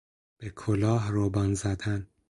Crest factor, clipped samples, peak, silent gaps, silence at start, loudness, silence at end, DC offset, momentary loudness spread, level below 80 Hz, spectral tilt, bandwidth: 16 dB; under 0.1%; -12 dBFS; none; 0.4 s; -28 LUFS; 0.25 s; under 0.1%; 12 LU; -46 dBFS; -7 dB/octave; 11.5 kHz